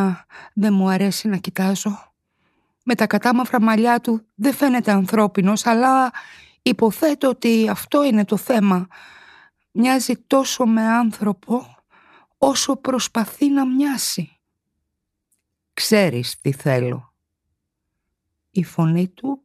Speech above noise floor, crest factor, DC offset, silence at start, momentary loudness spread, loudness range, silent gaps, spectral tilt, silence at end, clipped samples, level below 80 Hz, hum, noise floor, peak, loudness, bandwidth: 59 dB; 16 dB; under 0.1%; 0 s; 9 LU; 5 LU; none; -5 dB/octave; 0.1 s; under 0.1%; -64 dBFS; none; -78 dBFS; -4 dBFS; -19 LUFS; 14 kHz